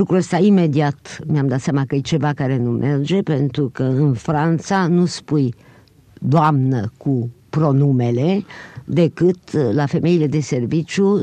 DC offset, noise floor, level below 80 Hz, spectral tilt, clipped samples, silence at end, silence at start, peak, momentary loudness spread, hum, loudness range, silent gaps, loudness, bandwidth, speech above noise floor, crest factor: under 0.1%; -48 dBFS; -54 dBFS; -7.5 dB/octave; under 0.1%; 0 s; 0 s; -4 dBFS; 7 LU; none; 1 LU; none; -18 LUFS; 9.4 kHz; 31 dB; 14 dB